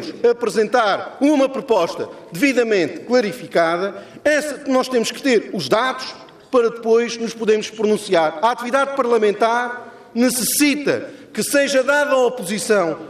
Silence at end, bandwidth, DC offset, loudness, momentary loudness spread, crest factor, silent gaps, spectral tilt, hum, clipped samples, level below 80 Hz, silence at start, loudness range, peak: 0 s; 15.5 kHz; under 0.1%; -18 LUFS; 8 LU; 14 dB; none; -3.5 dB/octave; none; under 0.1%; -62 dBFS; 0 s; 1 LU; -4 dBFS